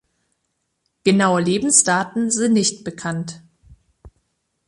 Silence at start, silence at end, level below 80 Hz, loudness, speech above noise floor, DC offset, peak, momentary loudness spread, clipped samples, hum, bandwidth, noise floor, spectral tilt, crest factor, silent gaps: 1.05 s; 0.6 s; -56 dBFS; -18 LUFS; 55 dB; under 0.1%; 0 dBFS; 14 LU; under 0.1%; none; 11.5 kHz; -73 dBFS; -3.5 dB/octave; 20 dB; none